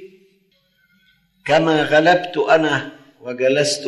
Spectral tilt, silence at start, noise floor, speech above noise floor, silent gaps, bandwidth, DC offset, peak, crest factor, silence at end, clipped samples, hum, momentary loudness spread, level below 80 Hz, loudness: -4 dB/octave; 0 s; -61 dBFS; 45 dB; none; 12 kHz; under 0.1%; -2 dBFS; 18 dB; 0 s; under 0.1%; none; 18 LU; -62 dBFS; -16 LUFS